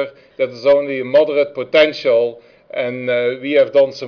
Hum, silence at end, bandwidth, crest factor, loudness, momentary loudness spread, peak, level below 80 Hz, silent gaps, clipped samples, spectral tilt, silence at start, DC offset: none; 0 s; 5.4 kHz; 12 dB; -16 LUFS; 9 LU; -4 dBFS; -60 dBFS; none; under 0.1%; -5.5 dB/octave; 0 s; under 0.1%